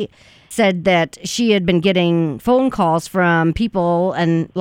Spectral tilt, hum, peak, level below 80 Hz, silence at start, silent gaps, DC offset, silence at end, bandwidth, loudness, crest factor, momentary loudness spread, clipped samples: -6 dB/octave; none; -2 dBFS; -42 dBFS; 0 s; none; under 0.1%; 0 s; 16 kHz; -16 LUFS; 16 dB; 4 LU; under 0.1%